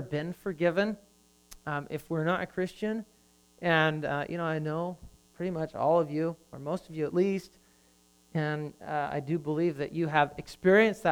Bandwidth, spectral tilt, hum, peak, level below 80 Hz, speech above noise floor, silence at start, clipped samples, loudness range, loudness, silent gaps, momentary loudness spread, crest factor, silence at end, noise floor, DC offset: 18.5 kHz; -7 dB/octave; none; -10 dBFS; -62 dBFS; 34 dB; 0 s; under 0.1%; 3 LU; -30 LUFS; none; 11 LU; 20 dB; 0 s; -63 dBFS; under 0.1%